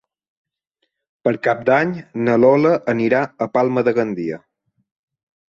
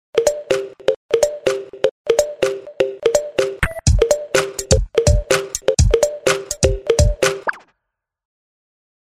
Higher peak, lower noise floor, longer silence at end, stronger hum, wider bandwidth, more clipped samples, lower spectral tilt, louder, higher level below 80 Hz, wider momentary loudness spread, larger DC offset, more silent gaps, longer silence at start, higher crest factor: about the same, -2 dBFS vs 0 dBFS; second, -73 dBFS vs -79 dBFS; second, 1.15 s vs 1.55 s; neither; second, 7.2 kHz vs 16 kHz; neither; first, -8 dB/octave vs -4 dB/octave; about the same, -18 LUFS vs -18 LUFS; second, -62 dBFS vs -26 dBFS; first, 10 LU vs 6 LU; neither; second, none vs 0.96-1.09 s, 1.91-2.05 s; first, 1.25 s vs 0.15 s; about the same, 16 dB vs 18 dB